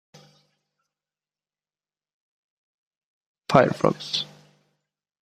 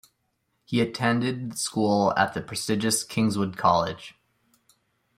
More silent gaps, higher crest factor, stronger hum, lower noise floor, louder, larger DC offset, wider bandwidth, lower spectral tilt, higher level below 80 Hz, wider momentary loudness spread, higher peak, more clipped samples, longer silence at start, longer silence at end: neither; first, 28 dB vs 20 dB; neither; first, under -90 dBFS vs -74 dBFS; first, -22 LUFS vs -25 LUFS; neither; second, 14.5 kHz vs 16 kHz; about the same, -5.5 dB/octave vs -4.5 dB/octave; about the same, -62 dBFS vs -62 dBFS; first, 17 LU vs 8 LU; first, 0 dBFS vs -6 dBFS; neither; first, 3.5 s vs 0.7 s; about the same, 1 s vs 1.05 s